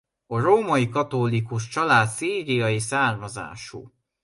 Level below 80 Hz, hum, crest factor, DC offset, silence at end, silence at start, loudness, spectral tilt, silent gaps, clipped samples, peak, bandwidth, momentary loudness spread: -58 dBFS; none; 18 dB; under 0.1%; 0.35 s; 0.3 s; -22 LUFS; -5 dB/octave; none; under 0.1%; -6 dBFS; 11.5 kHz; 16 LU